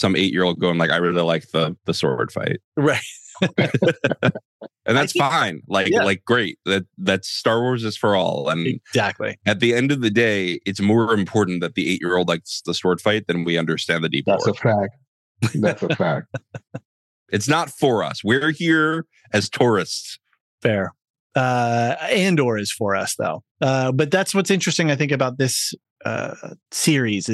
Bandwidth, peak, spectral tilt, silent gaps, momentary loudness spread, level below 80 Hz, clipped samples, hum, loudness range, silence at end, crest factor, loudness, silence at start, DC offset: 12.5 kHz; -4 dBFS; -4.5 dB/octave; 2.64-2.72 s, 4.45-4.60 s, 15.08-15.35 s, 16.85-17.26 s, 20.41-20.58 s, 21.10-21.30 s, 23.51-23.55 s, 25.90-25.96 s; 8 LU; -70 dBFS; under 0.1%; none; 2 LU; 0 s; 16 dB; -20 LUFS; 0 s; under 0.1%